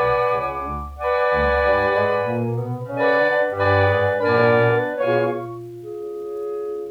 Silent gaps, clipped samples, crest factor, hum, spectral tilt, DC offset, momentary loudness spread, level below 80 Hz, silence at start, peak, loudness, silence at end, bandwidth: none; under 0.1%; 16 dB; none; -7.5 dB/octave; under 0.1%; 13 LU; -40 dBFS; 0 s; -4 dBFS; -20 LUFS; 0 s; 6.8 kHz